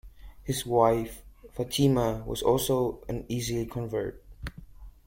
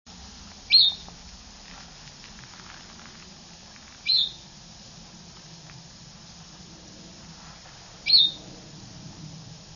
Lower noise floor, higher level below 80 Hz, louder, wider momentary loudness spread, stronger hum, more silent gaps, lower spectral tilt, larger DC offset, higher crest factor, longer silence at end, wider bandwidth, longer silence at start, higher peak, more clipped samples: about the same, -47 dBFS vs -47 dBFS; first, -46 dBFS vs -56 dBFS; second, -28 LUFS vs -19 LUFS; second, 19 LU vs 28 LU; neither; neither; first, -5.5 dB/octave vs -1 dB/octave; neither; about the same, 20 dB vs 24 dB; about the same, 0.15 s vs 0.25 s; first, 16.5 kHz vs 7.4 kHz; second, 0.05 s vs 0.2 s; about the same, -8 dBFS vs -6 dBFS; neither